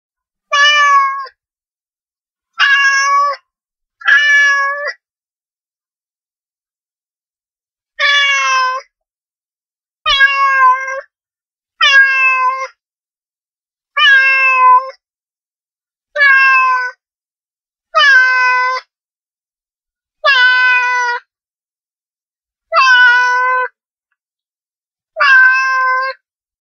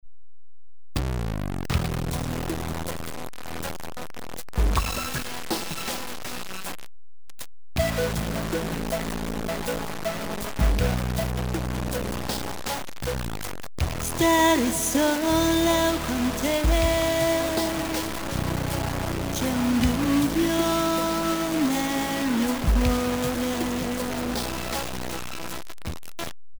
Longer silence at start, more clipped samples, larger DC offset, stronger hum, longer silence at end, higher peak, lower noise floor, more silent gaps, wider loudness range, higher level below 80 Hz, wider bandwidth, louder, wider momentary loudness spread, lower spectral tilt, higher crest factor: first, 0.5 s vs 0 s; neither; second, under 0.1% vs 0.9%; neither; first, 0.5 s vs 0 s; first, 0 dBFS vs -8 dBFS; first, under -90 dBFS vs -76 dBFS; first, 2.02-2.06 s, 6.39-6.43 s, 9.45-9.49 s, 19.23-19.27 s, 21.93-21.97 s, 23.91-23.95 s vs none; second, 5 LU vs 8 LU; second, -56 dBFS vs -34 dBFS; second, 7.2 kHz vs over 20 kHz; first, -10 LUFS vs -26 LUFS; about the same, 15 LU vs 13 LU; second, 4 dB/octave vs -4.5 dB/octave; about the same, 14 dB vs 16 dB